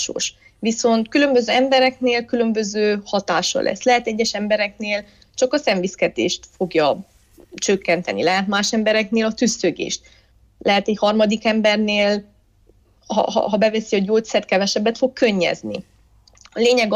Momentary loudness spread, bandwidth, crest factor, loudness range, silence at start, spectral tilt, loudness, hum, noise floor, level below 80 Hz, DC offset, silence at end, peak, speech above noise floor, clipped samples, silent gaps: 8 LU; 10.5 kHz; 14 dB; 2 LU; 0 s; -3.5 dB/octave; -19 LUFS; none; -55 dBFS; -56 dBFS; under 0.1%; 0 s; -6 dBFS; 36 dB; under 0.1%; none